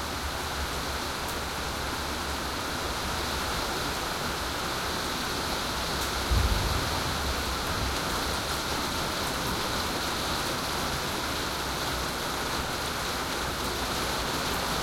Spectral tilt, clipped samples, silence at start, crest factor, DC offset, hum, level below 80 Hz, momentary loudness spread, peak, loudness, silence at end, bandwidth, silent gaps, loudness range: -3 dB/octave; under 0.1%; 0 s; 18 dB; under 0.1%; none; -38 dBFS; 3 LU; -14 dBFS; -29 LUFS; 0 s; 16.5 kHz; none; 2 LU